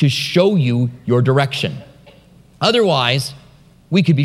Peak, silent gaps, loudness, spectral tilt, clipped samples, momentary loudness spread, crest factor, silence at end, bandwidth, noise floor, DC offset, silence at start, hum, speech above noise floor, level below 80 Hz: 0 dBFS; none; -16 LUFS; -6 dB/octave; under 0.1%; 8 LU; 16 dB; 0 s; 14 kHz; -47 dBFS; under 0.1%; 0 s; none; 32 dB; -56 dBFS